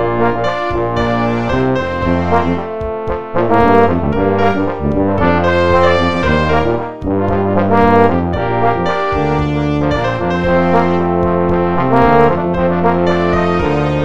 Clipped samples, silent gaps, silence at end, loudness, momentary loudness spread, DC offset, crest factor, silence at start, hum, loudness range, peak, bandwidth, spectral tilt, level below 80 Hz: under 0.1%; none; 0 s; -14 LUFS; 6 LU; 4%; 14 dB; 0 s; none; 2 LU; 0 dBFS; 8.2 kHz; -8 dB/octave; -30 dBFS